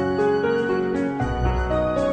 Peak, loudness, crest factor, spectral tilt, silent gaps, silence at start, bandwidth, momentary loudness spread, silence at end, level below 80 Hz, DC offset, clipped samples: -8 dBFS; -22 LUFS; 14 dB; -7.5 dB/octave; none; 0 s; 9 kHz; 3 LU; 0 s; -30 dBFS; under 0.1%; under 0.1%